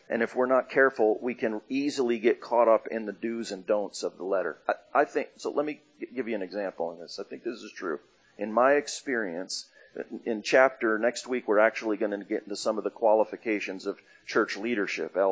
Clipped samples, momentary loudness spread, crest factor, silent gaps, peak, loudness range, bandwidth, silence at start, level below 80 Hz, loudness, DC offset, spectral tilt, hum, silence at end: under 0.1%; 14 LU; 22 dB; none; -6 dBFS; 6 LU; 8 kHz; 0.1 s; -82 dBFS; -28 LUFS; under 0.1%; -4 dB/octave; none; 0 s